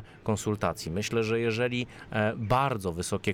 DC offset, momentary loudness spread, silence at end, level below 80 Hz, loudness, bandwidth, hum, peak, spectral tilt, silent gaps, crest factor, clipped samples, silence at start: under 0.1%; 6 LU; 0 s; -52 dBFS; -29 LUFS; 17 kHz; none; -14 dBFS; -5.5 dB/octave; none; 16 dB; under 0.1%; 0 s